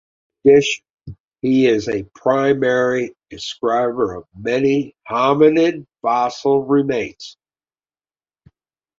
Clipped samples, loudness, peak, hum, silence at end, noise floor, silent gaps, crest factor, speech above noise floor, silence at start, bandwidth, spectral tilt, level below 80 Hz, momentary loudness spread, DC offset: under 0.1%; -17 LUFS; -2 dBFS; none; 1.7 s; under -90 dBFS; 0.90-0.94 s, 1.20-1.24 s; 16 dB; over 73 dB; 0.45 s; 7.6 kHz; -5.5 dB/octave; -54 dBFS; 14 LU; under 0.1%